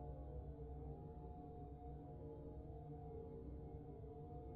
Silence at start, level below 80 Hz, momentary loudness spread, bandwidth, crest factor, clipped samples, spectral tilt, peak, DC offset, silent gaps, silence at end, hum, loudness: 0 s; -58 dBFS; 2 LU; 3.9 kHz; 12 dB; under 0.1%; -11 dB/octave; -42 dBFS; under 0.1%; none; 0 s; none; -55 LUFS